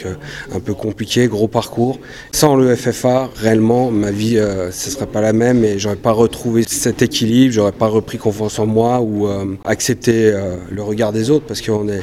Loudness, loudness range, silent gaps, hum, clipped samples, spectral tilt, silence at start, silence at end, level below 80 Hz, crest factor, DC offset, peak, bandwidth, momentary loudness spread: -16 LUFS; 2 LU; none; none; under 0.1%; -5.5 dB/octave; 0 s; 0 s; -42 dBFS; 16 dB; under 0.1%; 0 dBFS; 16 kHz; 9 LU